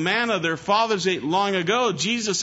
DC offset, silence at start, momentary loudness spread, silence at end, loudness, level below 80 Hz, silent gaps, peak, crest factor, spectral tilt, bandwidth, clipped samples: under 0.1%; 0 s; 2 LU; 0 s; -22 LUFS; -64 dBFS; none; -8 dBFS; 14 dB; -3 dB/octave; 8 kHz; under 0.1%